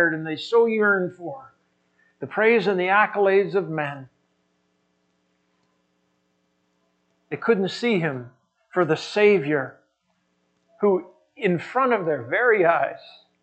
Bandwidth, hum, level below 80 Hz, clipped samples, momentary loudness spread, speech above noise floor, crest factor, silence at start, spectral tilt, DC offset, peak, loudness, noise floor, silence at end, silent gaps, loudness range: 8.4 kHz; none; -78 dBFS; under 0.1%; 16 LU; 49 dB; 18 dB; 0 s; -6.5 dB/octave; under 0.1%; -6 dBFS; -22 LUFS; -71 dBFS; 0.35 s; none; 8 LU